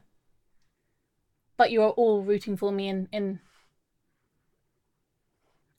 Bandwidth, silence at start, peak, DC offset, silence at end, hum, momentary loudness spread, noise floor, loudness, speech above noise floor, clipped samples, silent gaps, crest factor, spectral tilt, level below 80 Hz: 12.5 kHz; 1.6 s; -8 dBFS; under 0.1%; 2.4 s; none; 12 LU; -77 dBFS; -26 LUFS; 52 dB; under 0.1%; none; 22 dB; -7 dB/octave; -72 dBFS